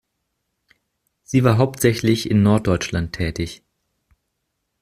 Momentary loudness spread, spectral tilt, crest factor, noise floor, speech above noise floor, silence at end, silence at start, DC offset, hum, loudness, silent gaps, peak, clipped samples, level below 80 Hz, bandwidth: 9 LU; -6 dB/octave; 18 dB; -75 dBFS; 57 dB; 1.25 s; 1.3 s; under 0.1%; none; -19 LUFS; none; -2 dBFS; under 0.1%; -44 dBFS; 15.5 kHz